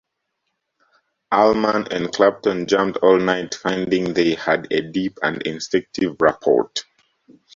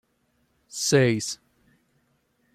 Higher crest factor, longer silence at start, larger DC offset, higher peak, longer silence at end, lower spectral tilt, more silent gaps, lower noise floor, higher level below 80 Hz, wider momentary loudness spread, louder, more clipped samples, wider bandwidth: about the same, 18 dB vs 22 dB; first, 1.3 s vs 0.75 s; neither; first, -2 dBFS vs -6 dBFS; second, 0.75 s vs 1.2 s; about the same, -5 dB/octave vs -4.5 dB/octave; neither; first, -76 dBFS vs -70 dBFS; first, -56 dBFS vs -64 dBFS; second, 8 LU vs 18 LU; first, -19 LUFS vs -23 LUFS; neither; second, 7.6 kHz vs 15 kHz